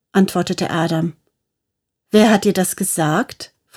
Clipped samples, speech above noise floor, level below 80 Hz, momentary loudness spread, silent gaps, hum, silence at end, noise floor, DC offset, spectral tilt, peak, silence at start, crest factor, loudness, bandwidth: under 0.1%; 63 dB; -58 dBFS; 10 LU; none; none; 0.3 s; -79 dBFS; under 0.1%; -5 dB/octave; 0 dBFS; 0.15 s; 18 dB; -17 LUFS; 17 kHz